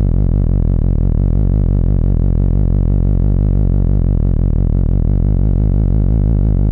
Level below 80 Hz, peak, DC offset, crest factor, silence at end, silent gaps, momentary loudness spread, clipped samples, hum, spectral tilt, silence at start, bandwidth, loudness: -14 dBFS; -4 dBFS; under 0.1%; 8 dB; 0 s; none; 1 LU; under 0.1%; none; -13 dB/octave; 0 s; 2 kHz; -15 LUFS